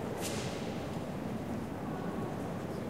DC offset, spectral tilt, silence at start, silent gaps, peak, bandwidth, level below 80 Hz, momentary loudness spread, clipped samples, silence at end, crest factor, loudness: 0.2%; -5.5 dB/octave; 0 s; none; -24 dBFS; 16 kHz; -56 dBFS; 3 LU; under 0.1%; 0 s; 14 dB; -38 LUFS